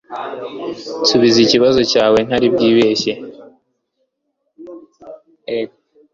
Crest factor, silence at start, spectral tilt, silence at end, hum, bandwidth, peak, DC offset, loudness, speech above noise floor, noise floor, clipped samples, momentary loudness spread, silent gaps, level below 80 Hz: 16 dB; 0.1 s; -4.5 dB/octave; 0.45 s; none; 7.6 kHz; 0 dBFS; under 0.1%; -14 LUFS; 57 dB; -71 dBFS; under 0.1%; 18 LU; none; -52 dBFS